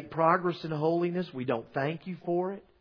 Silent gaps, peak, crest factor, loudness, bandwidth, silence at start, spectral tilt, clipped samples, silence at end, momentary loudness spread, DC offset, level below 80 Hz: none; -10 dBFS; 20 dB; -30 LUFS; 5.4 kHz; 0 s; -9 dB/octave; under 0.1%; 0.2 s; 8 LU; under 0.1%; -70 dBFS